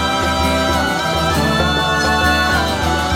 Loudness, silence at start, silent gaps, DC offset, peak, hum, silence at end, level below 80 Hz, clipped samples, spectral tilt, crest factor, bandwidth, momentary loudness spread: -15 LUFS; 0 s; none; under 0.1%; -2 dBFS; none; 0 s; -28 dBFS; under 0.1%; -4 dB/octave; 14 dB; 17 kHz; 3 LU